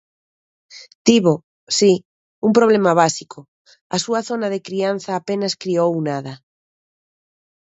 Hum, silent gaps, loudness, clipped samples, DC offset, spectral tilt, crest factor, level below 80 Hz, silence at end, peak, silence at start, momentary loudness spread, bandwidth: none; 0.95-1.05 s, 1.44-1.67 s, 2.05-2.42 s, 3.48-3.65 s, 3.81-3.90 s; -18 LUFS; under 0.1%; under 0.1%; -4.5 dB/octave; 20 dB; -66 dBFS; 1.4 s; 0 dBFS; 0.75 s; 11 LU; 8.2 kHz